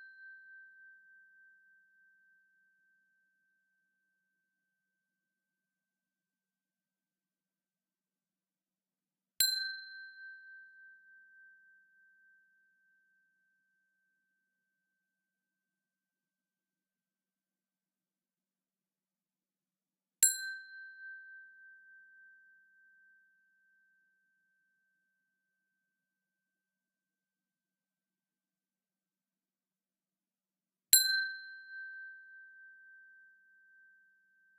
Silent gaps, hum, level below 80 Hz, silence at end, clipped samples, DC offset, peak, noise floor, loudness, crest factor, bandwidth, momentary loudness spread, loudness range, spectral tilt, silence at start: none; none; under -90 dBFS; 1.85 s; under 0.1%; under 0.1%; -8 dBFS; under -90 dBFS; -30 LUFS; 36 dB; 4.3 kHz; 30 LU; 19 LU; 5 dB/octave; 0 s